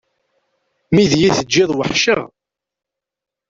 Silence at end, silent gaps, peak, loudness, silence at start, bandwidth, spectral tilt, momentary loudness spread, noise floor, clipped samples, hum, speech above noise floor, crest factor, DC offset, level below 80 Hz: 1.25 s; none; -2 dBFS; -15 LUFS; 0.9 s; 7.8 kHz; -4.5 dB/octave; 6 LU; -86 dBFS; under 0.1%; none; 71 dB; 16 dB; under 0.1%; -48 dBFS